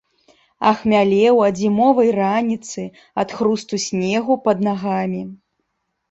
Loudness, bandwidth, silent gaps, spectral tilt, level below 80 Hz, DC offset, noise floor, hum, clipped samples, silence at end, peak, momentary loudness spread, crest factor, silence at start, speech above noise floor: -18 LUFS; 8 kHz; none; -5.5 dB/octave; -58 dBFS; under 0.1%; -73 dBFS; none; under 0.1%; 0.75 s; -2 dBFS; 12 LU; 16 dB; 0.6 s; 56 dB